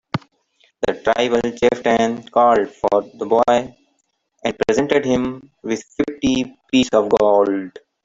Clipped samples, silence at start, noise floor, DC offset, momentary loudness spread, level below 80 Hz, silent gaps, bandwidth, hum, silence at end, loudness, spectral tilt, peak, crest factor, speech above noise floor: under 0.1%; 0.15 s; -68 dBFS; under 0.1%; 11 LU; -50 dBFS; none; 7.8 kHz; none; 0.25 s; -18 LUFS; -5 dB/octave; 0 dBFS; 18 dB; 51 dB